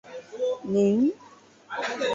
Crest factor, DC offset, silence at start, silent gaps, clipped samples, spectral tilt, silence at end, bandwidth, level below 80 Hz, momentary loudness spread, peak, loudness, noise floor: 14 dB; under 0.1%; 0.05 s; none; under 0.1%; -6 dB/octave; 0 s; 7.8 kHz; -68 dBFS; 17 LU; -12 dBFS; -26 LUFS; -50 dBFS